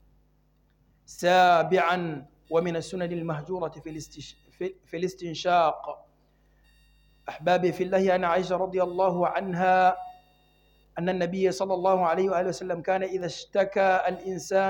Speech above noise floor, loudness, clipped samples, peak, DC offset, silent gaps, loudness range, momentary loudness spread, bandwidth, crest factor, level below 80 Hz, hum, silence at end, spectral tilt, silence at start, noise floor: 40 dB; -26 LUFS; under 0.1%; -10 dBFS; under 0.1%; none; 6 LU; 18 LU; 17 kHz; 18 dB; -62 dBFS; none; 0 s; -5.5 dB/octave; 1.1 s; -65 dBFS